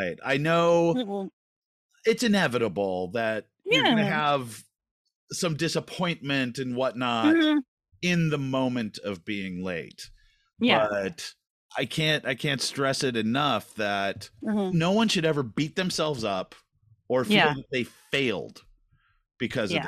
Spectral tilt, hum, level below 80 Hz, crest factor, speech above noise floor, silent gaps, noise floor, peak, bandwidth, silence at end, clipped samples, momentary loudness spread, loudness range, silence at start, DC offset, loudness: -5 dB/octave; none; -62 dBFS; 20 dB; 41 dB; 1.33-1.89 s, 4.91-5.05 s, 5.15-5.28 s, 7.68-7.77 s, 11.50-11.69 s; -66 dBFS; -6 dBFS; 14.5 kHz; 0 s; under 0.1%; 13 LU; 3 LU; 0 s; under 0.1%; -26 LUFS